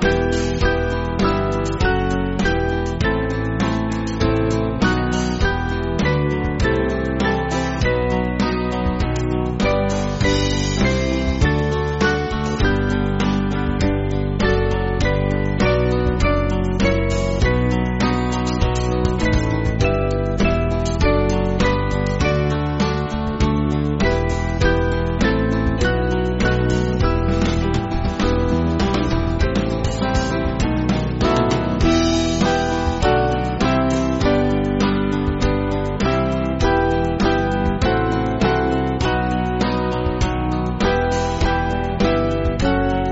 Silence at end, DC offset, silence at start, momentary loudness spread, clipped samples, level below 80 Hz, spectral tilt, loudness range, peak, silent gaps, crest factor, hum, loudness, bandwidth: 0 s; under 0.1%; 0 s; 3 LU; under 0.1%; -26 dBFS; -5.5 dB/octave; 2 LU; -4 dBFS; none; 14 dB; none; -19 LUFS; 8 kHz